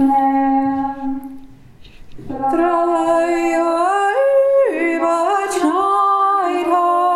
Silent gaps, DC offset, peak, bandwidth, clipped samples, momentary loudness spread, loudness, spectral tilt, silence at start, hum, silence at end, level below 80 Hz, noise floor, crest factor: none; under 0.1%; -4 dBFS; 13.5 kHz; under 0.1%; 9 LU; -16 LUFS; -4.5 dB/octave; 0 s; none; 0 s; -48 dBFS; -40 dBFS; 12 dB